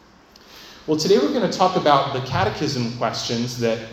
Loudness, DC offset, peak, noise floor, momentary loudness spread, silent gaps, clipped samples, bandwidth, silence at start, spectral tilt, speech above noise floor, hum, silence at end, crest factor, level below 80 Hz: -20 LUFS; under 0.1%; -2 dBFS; -49 dBFS; 7 LU; none; under 0.1%; 16 kHz; 0.5 s; -5 dB/octave; 29 dB; none; 0 s; 20 dB; -52 dBFS